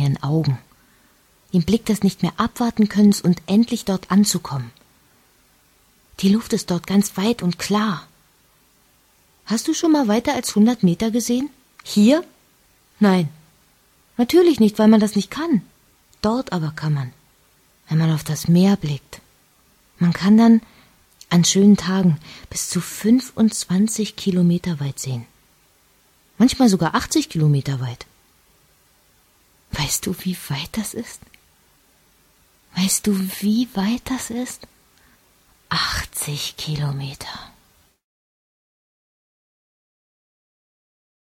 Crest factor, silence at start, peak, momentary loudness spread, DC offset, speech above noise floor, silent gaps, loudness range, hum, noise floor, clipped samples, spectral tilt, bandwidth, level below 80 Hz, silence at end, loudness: 20 dB; 0 s; -2 dBFS; 14 LU; under 0.1%; 39 dB; none; 8 LU; none; -58 dBFS; under 0.1%; -5.5 dB/octave; 16 kHz; -50 dBFS; 3.85 s; -19 LUFS